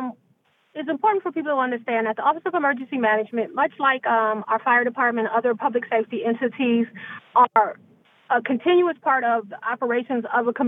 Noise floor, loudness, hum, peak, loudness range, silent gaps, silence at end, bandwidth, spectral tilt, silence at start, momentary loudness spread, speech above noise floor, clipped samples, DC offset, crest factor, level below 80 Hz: -64 dBFS; -22 LUFS; none; -4 dBFS; 2 LU; none; 0 s; 3.9 kHz; -8 dB/octave; 0 s; 7 LU; 42 dB; under 0.1%; under 0.1%; 18 dB; -82 dBFS